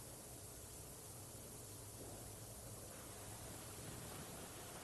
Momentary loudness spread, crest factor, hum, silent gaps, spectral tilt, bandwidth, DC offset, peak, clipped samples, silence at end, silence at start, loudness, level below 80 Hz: 2 LU; 14 dB; none; none; -3.5 dB/octave; 12.5 kHz; under 0.1%; -40 dBFS; under 0.1%; 0 s; 0 s; -52 LUFS; -66 dBFS